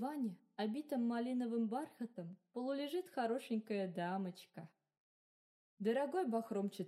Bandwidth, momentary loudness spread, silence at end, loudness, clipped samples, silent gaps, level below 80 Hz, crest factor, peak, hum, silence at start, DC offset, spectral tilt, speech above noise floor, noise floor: 14 kHz; 11 LU; 0 s; -41 LUFS; under 0.1%; 4.98-5.77 s; under -90 dBFS; 16 dB; -26 dBFS; none; 0 s; under 0.1%; -6.5 dB/octave; over 49 dB; under -90 dBFS